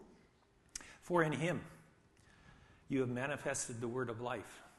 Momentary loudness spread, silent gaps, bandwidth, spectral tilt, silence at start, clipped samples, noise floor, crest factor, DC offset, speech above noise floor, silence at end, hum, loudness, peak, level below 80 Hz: 15 LU; none; 12.5 kHz; -5 dB/octave; 0 s; under 0.1%; -70 dBFS; 24 dB; under 0.1%; 31 dB; 0.1 s; none; -39 LUFS; -18 dBFS; -70 dBFS